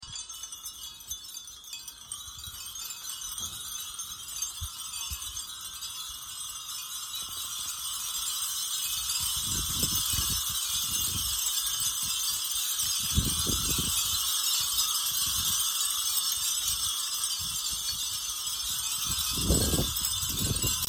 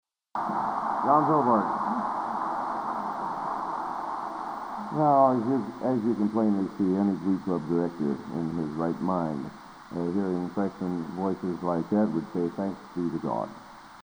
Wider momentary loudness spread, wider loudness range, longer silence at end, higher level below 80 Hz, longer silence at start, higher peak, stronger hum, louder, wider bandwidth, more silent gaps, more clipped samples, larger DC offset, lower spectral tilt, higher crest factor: about the same, 12 LU vs 11 LU; first, 10 LU vs 5 LU; about the same, 0 s vs 0 s; first, -46 dBFS vs -64 dBFS; second, 0 s vs 0.35 s; second, -12 dBFS vs -8 dBFS; neither; about the same, -28 LUFS vs -28 LUFS; second, 17 kHz vs over 20 kHz; neither; neither; neither; second, -1 dB/octave vs -8.5 dB/octave; about the same, 20 dB vs 20 dB